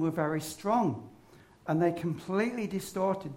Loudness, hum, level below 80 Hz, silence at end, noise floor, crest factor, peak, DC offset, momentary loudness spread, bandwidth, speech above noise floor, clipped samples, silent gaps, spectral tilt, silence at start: -31 LUFS; none; -66 dBFS; 0 s; -57 dBFS; 16 dB; -14 dBFS; under 0.1%; 6 LU; 16 kHz; 27 dB; under 0.1%; none; -6.5 dB/octave; 0 s